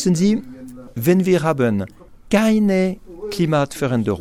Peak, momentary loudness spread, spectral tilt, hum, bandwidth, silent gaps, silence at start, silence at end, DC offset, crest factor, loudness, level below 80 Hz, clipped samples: 0 dBFS; 16 LU; -6.5 dB/octave; none; 16 kHz; none; 0 s; 0 s; under 0.1%; 18 dB; -19 LUFS; -48 dBFS; under 0.1%